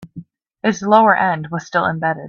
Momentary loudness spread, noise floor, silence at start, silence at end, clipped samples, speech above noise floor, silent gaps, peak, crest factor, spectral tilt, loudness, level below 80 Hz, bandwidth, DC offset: 10 LU; -39 dBFS; 0 s; 0 s; under 0.1%; 23 dB; none; 0 dBFS; 16 dB; -5.5 dB/octave; -16 LUFS; -60 dBFS; 7.4 kHz; under 0.1%